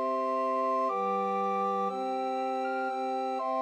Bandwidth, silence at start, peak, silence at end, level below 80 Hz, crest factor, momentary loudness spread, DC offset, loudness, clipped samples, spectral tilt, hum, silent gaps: 10 kHz; 0 s; -20 dBFS; 0 s; under -90 dBFS; 10 dB; 3 LU; under 0.1%; -30 LUFS; under 0.1%; -6 dB/octave; none; none